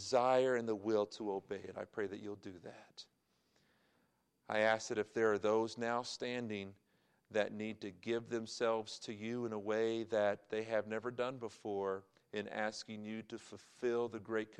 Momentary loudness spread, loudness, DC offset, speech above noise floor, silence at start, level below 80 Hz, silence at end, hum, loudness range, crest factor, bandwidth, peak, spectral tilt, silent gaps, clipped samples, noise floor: 13 LU; -39 LUFS; under 0.1%; 40 dB; 0 s; -84 dBFS; 0.05 s; none; 5 LU; 20 dB; 10.5 kHz; -20 dBFS; -4.5 dB/octave; none; under 0.1%; -78 dBFS